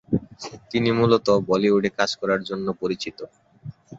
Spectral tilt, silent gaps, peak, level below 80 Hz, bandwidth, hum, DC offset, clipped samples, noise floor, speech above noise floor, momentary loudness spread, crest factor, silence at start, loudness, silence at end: -6 dB/octave; none; -4 dBFS; -54 dBFS; 8 kHz; none; under 0.1%; under 0.1%; -41 dBFS; 18 dB; 22 LU; 20 dB; 0.1 s; -22 LUFS; 0 s